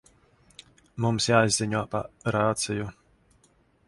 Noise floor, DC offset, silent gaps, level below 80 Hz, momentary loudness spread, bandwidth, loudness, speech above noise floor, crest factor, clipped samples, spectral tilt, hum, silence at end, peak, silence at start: -64 dBFS; under 0.1%; none; -56 dBFS; 12 LU; 11.5 kHz; -26 LUFS; 38 dB; 24 dB; under 0.1%; -4.5 dB/octave; none; 0.95 s; -4 dBFS; 0.95 s